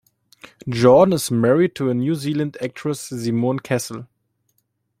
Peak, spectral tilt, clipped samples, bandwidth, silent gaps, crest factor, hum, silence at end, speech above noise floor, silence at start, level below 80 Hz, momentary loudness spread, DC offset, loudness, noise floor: 0 dBFS; -6 dB/octave; under 0.1%; 16 kHz; none; 20 dB; none; 0.95 s; 52 dB; 0.65 s; -58 dBFS; 13 LU; under 0.1%; -19 LUFS; -70 dBFS